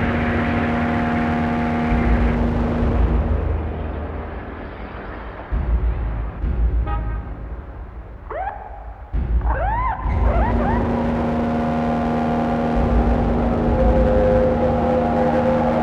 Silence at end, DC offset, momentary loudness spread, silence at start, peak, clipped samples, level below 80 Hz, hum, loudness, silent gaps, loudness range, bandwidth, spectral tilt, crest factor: 0 s; under 0.1%; 15 LU; 0 s; -6 dBFS; under 0.1%; -24 dBFS; none; -20 LUFS; none; 8 LU; 6 kHz; -9 dB/octave; 14 dB